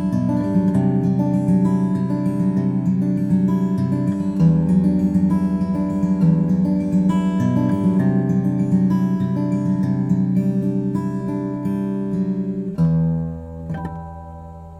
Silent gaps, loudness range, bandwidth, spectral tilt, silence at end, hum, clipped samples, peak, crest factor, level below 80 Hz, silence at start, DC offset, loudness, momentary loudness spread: none; 4 LU; 7.4 kHz; -10 dB/octave; 0 s; none; under 0.1%; -6 dBFS; 12 dB; -44 dBFS; 0 s; under 0.1%; -19 LUFS; 7 LU